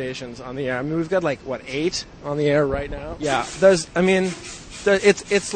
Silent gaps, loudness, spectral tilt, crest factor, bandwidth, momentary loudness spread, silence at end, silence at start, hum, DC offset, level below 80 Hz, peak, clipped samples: none; -21 LUFS; -4.5 dB/octave; 20 dB; 9.4 kHz; 13 LU; 0 s; 0 s; none; under 0.1%; -44 dBFS; -2 dBFS; under 0.1%